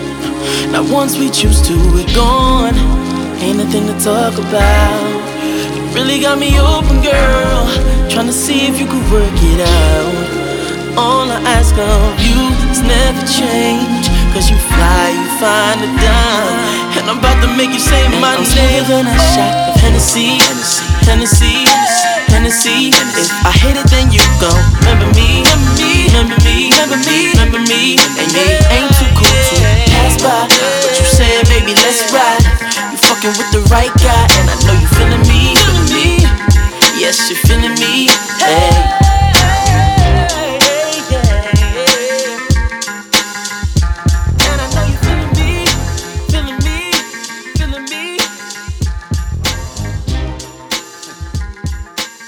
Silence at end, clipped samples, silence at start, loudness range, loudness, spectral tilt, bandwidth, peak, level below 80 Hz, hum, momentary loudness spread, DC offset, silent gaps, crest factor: 0 s; 0.2%; 0 s; 5 LU; -10 LUFS; -4 dB/octave; over 20 kHz; 0 dBFS; -14 dBFS; none; 10 LU; under 0.1%; none; 10 dB